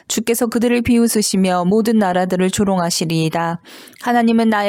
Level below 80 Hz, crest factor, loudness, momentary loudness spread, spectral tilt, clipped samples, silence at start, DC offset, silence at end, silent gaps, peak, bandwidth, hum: -46 dBFS; 12 dB; -16 LUFS; 5 LU; -5 dB/octave; under 0.1%; 0.1 s; under 0.1%; 0 s; none; -4 dBFS; 17 kHz; none